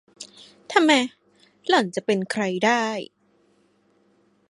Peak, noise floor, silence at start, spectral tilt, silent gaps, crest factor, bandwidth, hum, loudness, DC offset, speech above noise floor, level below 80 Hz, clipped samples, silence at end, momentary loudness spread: -2 dBFS; -63 dBFS; 0.2 s; -4 dB/octave; none; 24 dB; 11.5 kHz; 50 Hz at -50 dBFS; -22 LUFS; under 0.1%; 42 dB; -76 dBFS; under 0.1%; 1.45 s; 23 LU